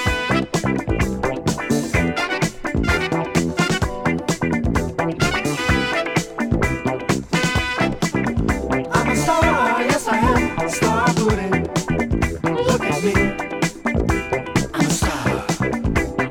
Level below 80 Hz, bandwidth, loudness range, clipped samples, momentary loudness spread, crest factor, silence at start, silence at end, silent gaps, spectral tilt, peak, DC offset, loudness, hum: -32 dBFS; 18.5 kHz; 2 LU; under 0.1%; 5 LU; 18 dB; 0 s; 0 s; none; -5 dB/octave; -2 dBFS; under 0.1%; -20 LUFS; none